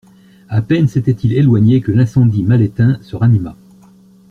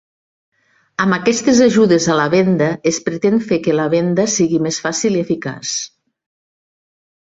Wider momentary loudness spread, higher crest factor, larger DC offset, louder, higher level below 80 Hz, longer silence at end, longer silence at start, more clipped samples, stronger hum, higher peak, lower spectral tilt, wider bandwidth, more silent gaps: second, 5 LU vs 10 LU; about the same, 12 dB vs 14 dB; neither; about the same, -13 LUFS vs -15 LUFS; first, -44 dBFS vs -56 dBFS; second, 0.75 s vs 1.35 s; second, 0.5 s vs 1 s; neither; neither; about the same, -2 dBFS vs -2 dBFS; first, -9.5 dB/octave vs -4.5 dB/octave; second, 6.6 kHz vs 8.2 kHz; neither